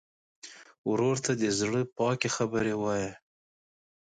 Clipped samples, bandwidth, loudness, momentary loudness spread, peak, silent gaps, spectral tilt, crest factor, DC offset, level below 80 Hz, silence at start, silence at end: under 0.1%; 9.6 kHz; -29 LUFS; 20 LU; -12 dBFS; 0.78-0.84 s; -4.5 dB/octave; 20 dB; under 0.1%; -62 dBFS; 0.45 s; 0.9 s